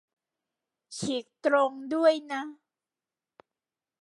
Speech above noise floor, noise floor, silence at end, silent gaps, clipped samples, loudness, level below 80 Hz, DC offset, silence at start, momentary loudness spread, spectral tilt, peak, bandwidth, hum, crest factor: over 63 dB; under -90 dBFS; 1.5 s; none; under 0.1%; -28 LUFS; -80 dBFS; under 0.1%; 0.9 s; 13 LU; -4 dB/octave; -12 dBFS; 11.5 kHz; none; 20 dB